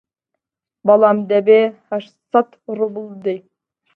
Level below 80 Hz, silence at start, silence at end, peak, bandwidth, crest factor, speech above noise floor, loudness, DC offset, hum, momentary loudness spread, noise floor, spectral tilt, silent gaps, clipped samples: -70 dBFS; 0.85 s; 0.55 s; 0 dBFS; 4.5 kHz; 18 dB; 64 dB; -17 LUFS; under 0.1%; none; 14 LU; -79 dBFS; -8.5 dB/octave; none; under 0.1%